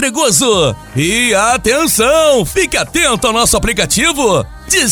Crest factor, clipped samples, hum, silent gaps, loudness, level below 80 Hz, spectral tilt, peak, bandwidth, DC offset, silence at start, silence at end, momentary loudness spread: 12 dB; under 0.1%; none; none; -11 LUFS; -30 dBFS; -2.5 dB/octave; 0 dBFS; over 20 kHz; under 0.1%; 0 s; 0 s; 4 LU